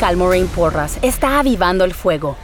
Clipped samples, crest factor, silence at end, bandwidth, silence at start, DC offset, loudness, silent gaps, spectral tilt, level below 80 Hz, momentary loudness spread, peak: under 0.1%; 14 dB; 0 s; over 20 kHz; 0 s; under 0.1%; -16 LUFS; none; -5 dB/octave; -26 dBFS; 4 LU; -2 dBFS